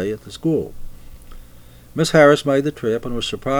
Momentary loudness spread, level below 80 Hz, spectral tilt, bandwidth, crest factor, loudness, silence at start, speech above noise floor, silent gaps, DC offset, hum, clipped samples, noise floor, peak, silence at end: 14 LU; -40 dBFS; -5.5 dB/octave; over 20 kHz; 18 dB; -18 LUFS; 0 s; 24 dB; none; under 0.1%; none; under 0.1%; -42 dBFS; -2 dBFS; 0 s